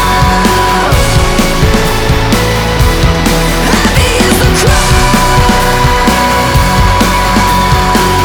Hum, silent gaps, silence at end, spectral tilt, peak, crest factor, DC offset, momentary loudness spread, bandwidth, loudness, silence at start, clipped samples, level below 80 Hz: none; none; 0 s; -4.5 dB/octave; 0 dBFS; 8 dB; under 0.1%; 2 LU; over 20 kHz; -8 LUFS; 0 s; 0.4%; -14 dBFS